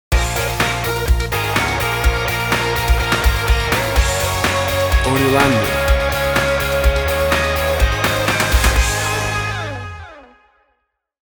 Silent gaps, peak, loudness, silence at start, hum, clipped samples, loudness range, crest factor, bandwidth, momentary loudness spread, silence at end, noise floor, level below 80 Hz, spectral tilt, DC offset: none; -2 dBFS; -17 LUFS; 0.1 s; none; under 0.1%; 2 LU; 16 dB; over 20 kHz; 4 LU; 1 s; -69 dBFS; -22 dBFS; -4 dB/octave; under 0.1%